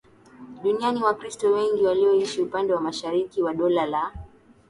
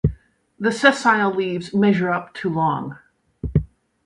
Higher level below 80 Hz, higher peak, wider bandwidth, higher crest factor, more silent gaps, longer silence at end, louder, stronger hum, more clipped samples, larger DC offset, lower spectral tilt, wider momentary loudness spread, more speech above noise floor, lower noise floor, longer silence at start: second, -54 dBFS vs -38 dBFS; second, -10 dBFS vs 0 dBFS; about the same, 11.5 kHz vs 11.5 kHz; second, 14 dB vs 20 dB; neither; about the same, 0.4 s vs 0.4 s; second, -24 LUFS vs -20 LUFS; neither; neither; neither; about the same, -5 dB/octave vs -6 dB/octave; second, 7 LU vs 11 LU; about the same, 24 dB vs 24 dB; about the same, -46 dBFS vs -43 dBFS; first, 0.4 s vs 0.05 s